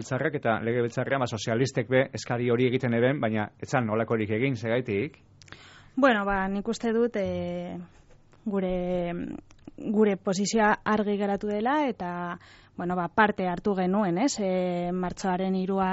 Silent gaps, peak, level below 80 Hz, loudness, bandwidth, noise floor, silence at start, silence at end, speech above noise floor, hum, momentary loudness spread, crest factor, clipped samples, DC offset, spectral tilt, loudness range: none; -8 dBFS; -54 dBFS; -27 LUFS; 8 kHz; -50 dBFS; 0 s; 0 s; 23 dB; none; 11 LU; 20 dB; under 0.1%; under 0.1%; -5.5 dB/octave; 3 LU